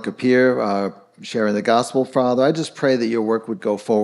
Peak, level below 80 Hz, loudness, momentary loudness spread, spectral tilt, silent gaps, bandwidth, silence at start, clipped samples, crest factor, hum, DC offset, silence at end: -4 dBFS; -74 dBFS; -19 LUFS; 8 LU; -5.5 dB/octave; none; 12 kHz; 0 s; under 0.1%; 16 dB; none; under 0.1%; 0 s